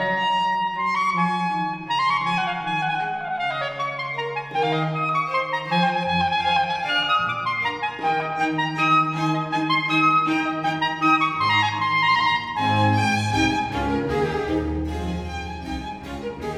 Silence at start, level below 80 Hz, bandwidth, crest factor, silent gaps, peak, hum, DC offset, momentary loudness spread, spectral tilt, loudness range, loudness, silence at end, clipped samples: 0 s; -42 dBFS; 13.5 kHz; 16 dB; none; -6 dBFS; none; under 0.1%; 8 LU; -5 dB/octave; 4 LU; -22 LUFS; 0 s; under 0.1%